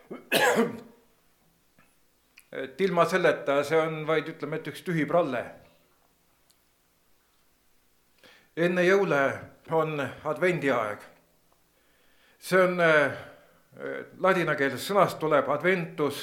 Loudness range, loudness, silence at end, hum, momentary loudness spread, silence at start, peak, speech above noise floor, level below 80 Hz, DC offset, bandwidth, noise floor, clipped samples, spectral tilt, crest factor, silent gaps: 7 LU; -26 LUFS; 0 s; none; 16 LU; 0.1 s; -8 dBFS; 41 dB; -74 dBFS; under 0.1%; 18 kHz; -67 dBFS; under 0.1%; -5 dB/octave; 20 dB; none